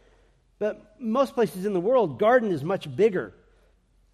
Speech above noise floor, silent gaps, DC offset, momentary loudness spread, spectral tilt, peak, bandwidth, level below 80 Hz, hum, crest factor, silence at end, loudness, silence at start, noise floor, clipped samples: 38 dB; none; under 0.1%; 11 LU; -7 dB/octave; -8 dBFS; 14 kHz; -62 dBFS; none; 18 dB; 0.85 s; -25 LUFS; 0.6 s; -62 dBFS; under 0.1%